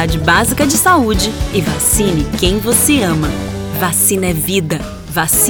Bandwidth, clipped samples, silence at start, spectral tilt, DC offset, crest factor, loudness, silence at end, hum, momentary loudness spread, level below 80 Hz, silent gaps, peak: over 20 kHz; under 0.1%; 0 s; -3.5 dB/octave; under 0.1%; 14 dB; -13 LUFS; 0 s; none; 9 LU; -26 dBFS; none; 0 dBFS